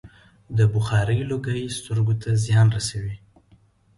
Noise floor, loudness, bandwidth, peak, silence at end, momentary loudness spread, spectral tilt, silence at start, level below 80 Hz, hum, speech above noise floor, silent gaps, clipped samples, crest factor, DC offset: -57 dBFS; -22 LUFS; 11.5 kHz; -8 dBFS; 0.8 s; 10 LU; -6 dB/octave; 0.05 s; -46 dBFS; none; 36 dB; none; under 0.1%; 14 dB; under 0.1%